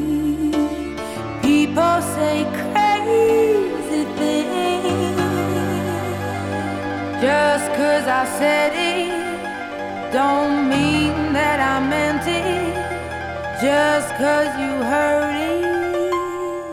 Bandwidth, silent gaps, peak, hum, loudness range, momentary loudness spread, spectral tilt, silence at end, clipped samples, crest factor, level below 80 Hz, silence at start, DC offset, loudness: 16 kHz; none; -6 dBFS; none; 2 LU; 9 LU; -5 dB/octave; 0 s; under 0.1%; 12 dB; -48 dBFS; 0 s; under 0.1%; -19 LUFS